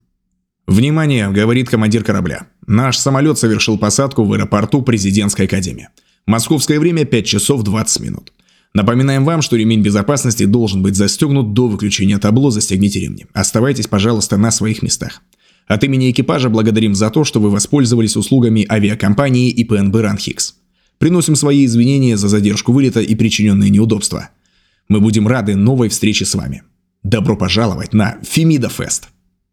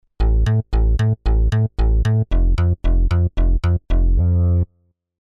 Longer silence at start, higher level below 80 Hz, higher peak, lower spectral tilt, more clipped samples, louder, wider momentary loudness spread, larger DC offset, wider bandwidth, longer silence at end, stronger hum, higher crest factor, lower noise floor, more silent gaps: first, 0.7 s vs 0.2 s; second, -44 dBFS vs -18 dBFS; first, 0 dBFS vs -8 dBFS; second, -5 dB/octave vs -8.5 dB/octave; neither; first, -13 LUFS vs -19 LUFS; first, 7 LU vs 2 LU; neither; first, 16 kHz vs 6.2 kHz; about the same, 0.55 s vs 0.55 s; neither; first, 14 dB vs 8 dB; first, -68 dBFS vs -63 dBFS; neither